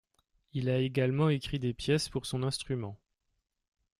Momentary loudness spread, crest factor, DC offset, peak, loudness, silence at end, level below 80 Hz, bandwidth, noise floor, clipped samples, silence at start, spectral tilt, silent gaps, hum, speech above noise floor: 9 LU; 18 dB; under 0.1%; -16 dBFS; -32 LUFS; 1.05 s; -56 dBFS; 13.5 kHz; -74 dBFS; under 0.1%; 0.55 s; -6 dB/octave; none; none; 43 dB